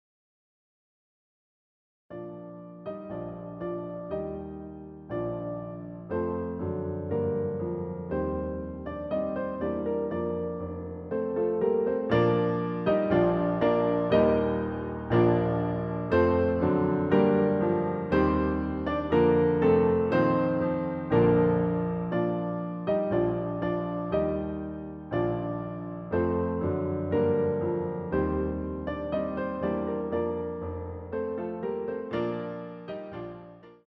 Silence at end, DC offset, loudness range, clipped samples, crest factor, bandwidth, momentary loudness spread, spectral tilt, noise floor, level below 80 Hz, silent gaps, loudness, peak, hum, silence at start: 0.15 s; under 0.1%; 11 LU; under 0.1%; 18 dB; 5.8 kHz; 14 LU; -10.5 dB/octave; -48 dBFS; -48 dBFS; none; -28 LUFS; -10 dBFS; none; 2.1 s